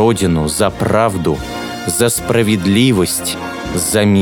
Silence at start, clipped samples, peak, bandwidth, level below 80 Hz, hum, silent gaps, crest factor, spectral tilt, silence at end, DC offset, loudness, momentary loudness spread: 0 s; under 0.1%; 0 dBFS; over 20 kHz; -36 dBFS; none; none; 14 dB; -4.5 dB/octave; 0 s; under 0.1%; -15 LUFS; 9 LU